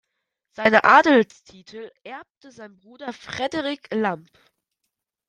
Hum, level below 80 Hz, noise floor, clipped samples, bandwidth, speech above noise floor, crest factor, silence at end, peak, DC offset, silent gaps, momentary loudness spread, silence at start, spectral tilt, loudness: none; -66 dBFS; -80 dBFS; under 0.1%; 9.8 kHz; 58 dB; 22 dB; 1.1 s; -2 dBFS; under 0.1%; 2.30-2.41 s; 25 LU; 0.6 s; -5 dB/octave; -19 LUFS